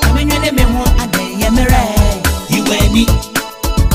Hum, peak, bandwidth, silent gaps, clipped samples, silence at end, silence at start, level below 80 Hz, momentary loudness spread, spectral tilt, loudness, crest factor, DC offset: none; 0 dBFS; 16.5 kHz; none; under 0.1%; 0 s; 0 s; -16 dBFS; 5 LU; -4.5 dB/octave; -13 LUFS; 12 dB; under 0.1%